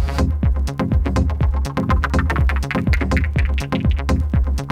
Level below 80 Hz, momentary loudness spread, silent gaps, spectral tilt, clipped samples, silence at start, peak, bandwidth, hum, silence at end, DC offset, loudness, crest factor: -20 dBFS; 2 LU; none; -7 dB/octave; under 0.1%; 0 s; -4 dBFS; 10.5 kHz; none; 0 s; under 0.1%; -20 LUFS; 14 dB